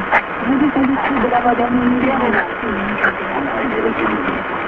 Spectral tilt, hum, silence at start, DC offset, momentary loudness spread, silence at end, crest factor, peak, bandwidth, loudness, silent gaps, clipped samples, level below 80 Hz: -8 dB/octave; none; 0 s; under 0.1%; 5 LU; 0 s; 16 dB; 0 dBFS; 5 kHz; -17 LUFS; none; under 0.1%; -42 dBFS